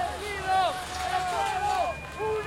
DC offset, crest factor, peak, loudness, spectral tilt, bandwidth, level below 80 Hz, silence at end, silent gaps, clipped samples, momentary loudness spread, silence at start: under 0.1%; 14 dB; -14 dBFS; -28 LUFS; -3 dB/octave; 16.5 kHz; -48 dBFS; 0 s; none; under 0.1%; 6 LU; 0 s